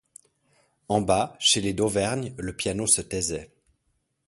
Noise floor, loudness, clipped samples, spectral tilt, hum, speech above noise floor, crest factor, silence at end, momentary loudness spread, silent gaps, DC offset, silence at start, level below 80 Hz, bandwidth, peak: -74 dBFS; -24 LUFS; under 0.1%; -3 dB/octave; none; 49 dB; 22 dB; 0.8 s; 9 LU; none; under 0.1%; 0.9 s; -50 dBFS; 12 kHz; -4 dBFS